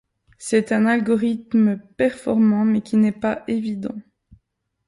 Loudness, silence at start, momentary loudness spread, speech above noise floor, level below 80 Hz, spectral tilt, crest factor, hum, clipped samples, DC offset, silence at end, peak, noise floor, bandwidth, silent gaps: -20 LUFS; 0.4 s; 10 LU; 52 dB; -58 dBFS; -6.5 dB/octave; 14 dB; none; under 0.1%; under 0.1%; 0.85 s; -6 dBFS; -71 dBFS; 11.5 kHz; none